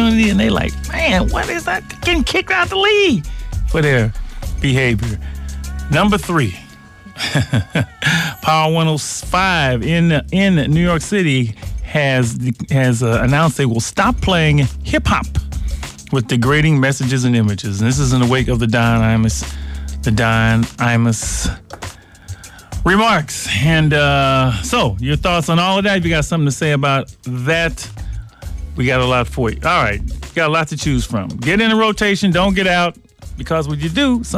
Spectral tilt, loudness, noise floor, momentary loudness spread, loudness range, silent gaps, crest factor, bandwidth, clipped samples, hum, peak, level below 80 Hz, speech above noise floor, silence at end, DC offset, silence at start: -5 dB/octave; -15 LUFS; -39 dBFS; 13 LU; 3 LU; none; 12 dB; 15.5 kHz; under 0.1%; none; -4 dBFS; -28 dBFS; 24 dB; 0 s; under 0.1%; 0 s